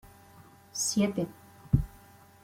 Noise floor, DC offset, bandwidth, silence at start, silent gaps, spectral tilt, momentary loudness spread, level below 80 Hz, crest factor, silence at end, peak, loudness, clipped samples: -55 dBFS; under 0.1%; 16.5 kHz; 0.05 s; none; -5 dB/octave; 12 LU; -44 dBFS; 24 dB; 0.55 s; -10 dBFS; -30 LUFS; under 0.1%